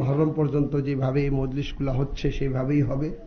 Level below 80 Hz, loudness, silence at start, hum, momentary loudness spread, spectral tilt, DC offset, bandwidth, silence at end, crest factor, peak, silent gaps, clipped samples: -34 dBFS; -25 LUFS; 0 s; none; 5 LU; -9 dB/octave; under 0.1%; 6.6 kHz; 0 s; 14 dB; -10 dBFS; none; under 0.1%